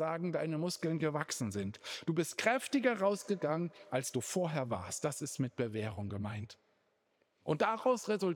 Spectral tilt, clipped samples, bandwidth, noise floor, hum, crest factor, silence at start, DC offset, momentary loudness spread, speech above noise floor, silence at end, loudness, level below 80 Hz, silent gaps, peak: -5 dB/octave; under 0.1%; over 20 kHz; -77 dBFS; none; 20 dB; 0 s; under 0.1%; 9 LU; 42 dB; 0 s; -36 LUFS; -78 dBFS; none; -16 dBFS